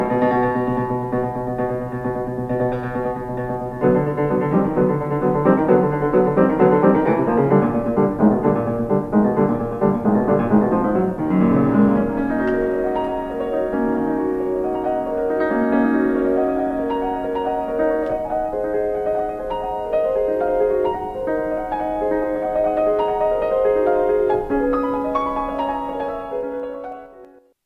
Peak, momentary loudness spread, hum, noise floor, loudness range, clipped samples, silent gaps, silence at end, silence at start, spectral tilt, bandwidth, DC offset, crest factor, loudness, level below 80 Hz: -2 dBFS; 8 LU; none; -46 dBFS; 5 LU; under 0.1%; none; 0.4 s; 0 s; -9.5 dB/octave; 6 kHz; under 0.1%; 16 dB; -20 LUFS; -42 dBFS